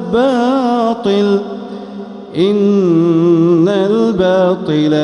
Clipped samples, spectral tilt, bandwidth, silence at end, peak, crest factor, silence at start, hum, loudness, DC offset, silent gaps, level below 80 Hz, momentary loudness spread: under 0.1%; -7.5 dB/octave; 10 kHz; 0 s; -2 dBFS; 12 dB; 0 s; none; -12 LUFS; under 0.1%; none; -50 dBFS; 15 LU